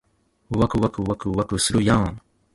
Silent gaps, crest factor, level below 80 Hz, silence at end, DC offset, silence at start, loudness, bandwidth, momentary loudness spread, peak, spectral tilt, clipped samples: none; 20 dB; -40 dBFS; 0.35 s; under 0.1%; 0.5 s; -22 LUFS; 11.5 kHz; 8 LU; -4 dBFS; -5 dB/octave; under 0.1%